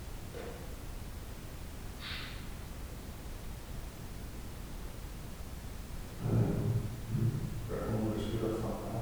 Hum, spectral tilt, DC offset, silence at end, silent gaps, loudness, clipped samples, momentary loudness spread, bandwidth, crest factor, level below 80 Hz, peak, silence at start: none; -6.5 dB/octave; under 0.1%; 0 s; none; -39 LUFS; under 0.1%; 12 LU; over 20 kHz; 18 dB; -46 dBFS; -18 dBFS; 0 s